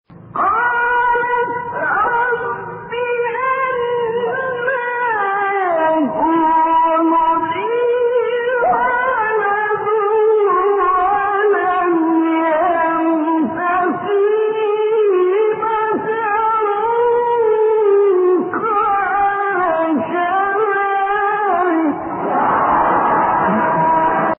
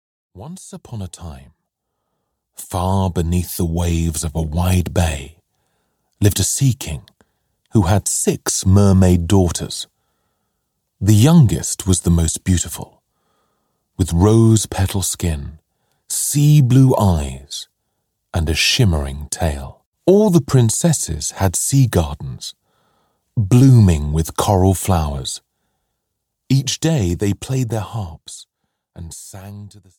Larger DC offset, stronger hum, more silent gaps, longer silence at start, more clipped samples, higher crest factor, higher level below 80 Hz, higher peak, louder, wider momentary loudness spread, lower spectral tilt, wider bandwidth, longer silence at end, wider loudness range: neither; neither; second, none vs 19.86-19.92 s; second, 0.1 s vs 0.35 s; neither; about the same, 12 dB vs 16 dB; second, -52 dBFS vs -32 dBFS; about the same, -4 dBFS vs -2 dBFS; about the same, -16 LUFS vs -16 LUFS; second, 5 LU vs 20 LU; second, 1 dB/octave vs -5.5 dB/octave; second, 3.7 kHz vs 17.5 kHz; second, 0.05 s vs 0.3 s; second, 3 LU vs 6 LU